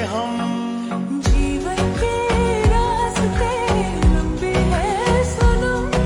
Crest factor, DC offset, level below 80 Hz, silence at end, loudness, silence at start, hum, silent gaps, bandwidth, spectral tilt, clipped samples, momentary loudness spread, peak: 14 dB; under 0.1%; -24 dBFS; 0 s; -19 LUFS; 0 s; none; none; 11.5 kHz; -6 dB/octave; under 0.1%; 5 LU; -4 dBFS